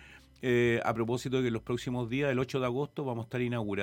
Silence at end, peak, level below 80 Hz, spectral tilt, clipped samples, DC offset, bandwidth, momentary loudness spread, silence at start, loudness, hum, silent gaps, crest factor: 0 s; -14 dBFS; -60 dBFS; -6.5 dB/octave; under 0.1%; under 0.1%; 16.5 kHz; 7 LU; 0 s; -31 LUFS; none; none; 18 dB